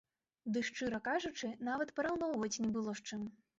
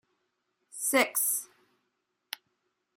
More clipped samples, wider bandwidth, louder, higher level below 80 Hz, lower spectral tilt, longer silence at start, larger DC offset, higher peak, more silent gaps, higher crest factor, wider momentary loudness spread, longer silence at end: neither; second, 8 kHz vs 16 kHz; second, -39 LUFS vs -27 LUFS; first, -72 dBFS vs -86 dBFS; first, -3.5 dB/octave vs 0 dB/octave; second, 0.45 s vs 0.75 s; neither; second, -26 dBFS vs -10 dBFS; neither; second, 14 dB vs 24 dB; second, 6 LU vs 18 LU; second, 0.25 s vs 1.5 s